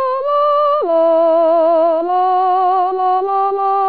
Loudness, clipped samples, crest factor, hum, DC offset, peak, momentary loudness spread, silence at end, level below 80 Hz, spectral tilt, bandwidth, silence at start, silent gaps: -14 LUFS; under 0.1%; 8 dB; none; 0.6%; -6 dBFS; 3 LU; 0 s; -68 dBFS; -1 dB/octave; 4.8 kHz; 0 s; none